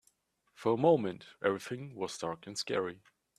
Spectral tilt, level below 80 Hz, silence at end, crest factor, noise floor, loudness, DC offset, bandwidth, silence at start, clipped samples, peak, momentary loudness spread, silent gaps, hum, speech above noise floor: -5 dB/octave; -76 dBFS; 0.45 s; 20 dB; -73 dBFS; -34 LUFS; under 0.1%; 13.5 kHz; 0.6 s; under 0.1%; -14 dBFS; 13 LU; none; none; 40 dB